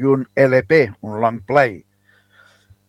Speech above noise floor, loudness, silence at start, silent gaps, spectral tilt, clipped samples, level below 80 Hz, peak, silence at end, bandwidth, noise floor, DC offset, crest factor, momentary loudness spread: 41 dB; -17 LUFS; 0 s; none; -8 dB/octave; under 0.1%; -58 dBFS; 0 dBFS; 1.1 s; 12 kHz; -57 dBFS; under 0.1%; 18 dB; 7 LU